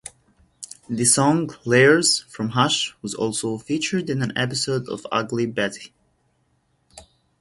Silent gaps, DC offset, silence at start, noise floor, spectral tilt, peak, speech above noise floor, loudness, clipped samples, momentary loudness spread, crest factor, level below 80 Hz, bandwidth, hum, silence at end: none; under 0.1%; 0.05 s; -66 dBFS; -3.5 dB/octave; -2 dBFS; 45 dB; -21 LUFS; under 0.1%; 13 LU; 22 dB; -60 dBFS; 11.5 kHz; none; 0.4 s